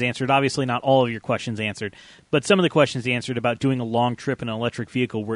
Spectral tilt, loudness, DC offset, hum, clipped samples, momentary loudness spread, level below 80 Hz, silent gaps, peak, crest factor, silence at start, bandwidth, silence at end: -5.5 dB/octave; -22 LUFS; under 0.1%; none; under 0.1%; 8 LU; -58 dBFS; none; -4 dBFS; 18 dB; 0 s; 11 kHz; 0 s